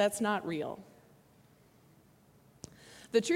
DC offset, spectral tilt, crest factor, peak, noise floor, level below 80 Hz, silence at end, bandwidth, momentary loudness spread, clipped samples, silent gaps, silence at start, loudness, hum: under 0.1%; -4 dB/octave; 22 dB; -14 dBFS; -63 dBFS; -74 dBFS; 0 s; 16.5 kHz; 22 LU; under 0.1%; none; 0 s; -34 LUFS; none